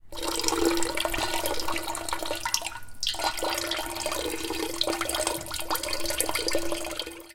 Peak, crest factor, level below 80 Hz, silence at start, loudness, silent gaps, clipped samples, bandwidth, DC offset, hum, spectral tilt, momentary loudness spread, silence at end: -4 dBFS; 24 dB; -46 dBFS; 0.05 s; -28 LUFS; none; under 0.1%; 17 kHz; under 0.1%; none; -1.5 dB/octave; 5 LU; 0 s